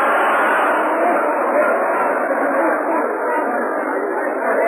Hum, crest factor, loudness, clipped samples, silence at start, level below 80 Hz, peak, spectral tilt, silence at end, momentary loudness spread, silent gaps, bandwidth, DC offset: none; 12 dB; -17 LUFS; under 0.1%; 0 s; -82 dBFS; -6 dBFS; -4.5 dB/octave; 0 s; 5 LU; none; 14.5 kHz; under 0.1%